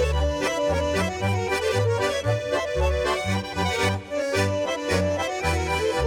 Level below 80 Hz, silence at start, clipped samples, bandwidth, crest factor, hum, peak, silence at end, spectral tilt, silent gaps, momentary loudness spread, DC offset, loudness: -34 dBFS; 0 s; under 0.1%; 18 kHz; 14 dB; none; -10 dBFS; 0 s; -5 dB/octave; none; 2 LU; under 0.1%; -24 LUFS